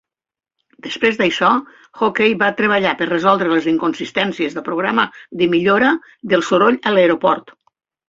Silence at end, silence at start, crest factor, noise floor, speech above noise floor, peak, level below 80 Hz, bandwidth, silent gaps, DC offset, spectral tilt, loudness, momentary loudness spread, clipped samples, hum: 0.7 s; 0.85 s; 16 dB; -90 dBFS; 74 dB; 0 dBFS; -58 dBFS; 7.8 kHz; none; under 0.1%; -5.5 dB/octave; -16 LUFS; 7 LU; under 0.1%; none